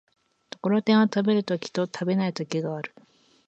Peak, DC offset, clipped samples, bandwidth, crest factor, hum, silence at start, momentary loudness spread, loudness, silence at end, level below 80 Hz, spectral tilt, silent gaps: -8 dBFS; under 0.1%; under 0.1%; 8 kHz; 18 dB; none; 0.65 s; 13 LU; -25 LUFS; 0.6 s; -74 dBFS; -6.5 dB/octave; none